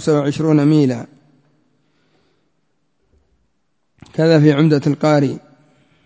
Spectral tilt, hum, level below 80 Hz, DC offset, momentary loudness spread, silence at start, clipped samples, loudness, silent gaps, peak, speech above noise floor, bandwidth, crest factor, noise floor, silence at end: -7.5 dB/octave; none; -60 dBFS; under 0.1%; 16 LU; 0 s; under 0.1%; -15 LUFS; none; 0 dBFS; 56 dB; 8 kHz; 18 dB; -70 dBFS; 0.65 s